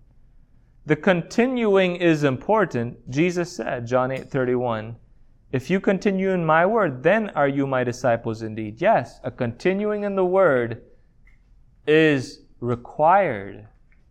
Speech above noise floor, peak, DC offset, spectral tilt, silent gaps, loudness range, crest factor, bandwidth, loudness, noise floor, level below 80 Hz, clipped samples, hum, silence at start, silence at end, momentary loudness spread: 32 dB; -4 dBFS; under 0.1%; -6.5 dB/octave; none; 3 LU; 18 dB; 11.5 kHz; -22 LUFS; -53 dBFS; -52 dBFS; under 0.1%; none; 0.85 s; 0.45 s; 12 LU